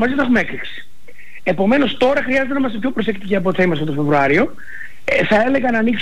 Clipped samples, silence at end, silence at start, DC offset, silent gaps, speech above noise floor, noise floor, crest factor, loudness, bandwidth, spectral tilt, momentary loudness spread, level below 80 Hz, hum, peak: under 0.1%; 0 s; 0 s; 5%; none; 26 dB; -43 dBFS; 12 dB; -17 LUFS; 13 kHz; -6.5 dB/octave; 12 LU; -46 dBFS; none; -6 dBFS